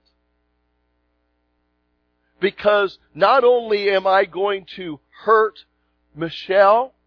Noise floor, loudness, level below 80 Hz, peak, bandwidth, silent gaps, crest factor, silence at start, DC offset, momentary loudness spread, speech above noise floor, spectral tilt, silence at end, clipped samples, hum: -68 dBFS; -18 LUFS; -62 dBFS; -2 dBFS; 5.4 kHz; none; 18 dB; 2.4 s; under 0.1%; 15 LU; 51 dB; -6.5 dB/octave; 0.2 s; under 0.1%; 60 Hz at -60 dBFS